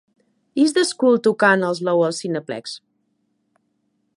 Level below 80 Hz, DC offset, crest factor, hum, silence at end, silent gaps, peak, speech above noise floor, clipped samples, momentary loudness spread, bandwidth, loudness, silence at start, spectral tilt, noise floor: -76 dBFS; under 0.1%; 18 dB; none; 1.4 s; none; -2 dBFS; 51 dB; under 0.1%; 14 LU; 11.5 kHz; -19 LUFS; 0.55 s; -4.5 dB/octave; -69 dBFS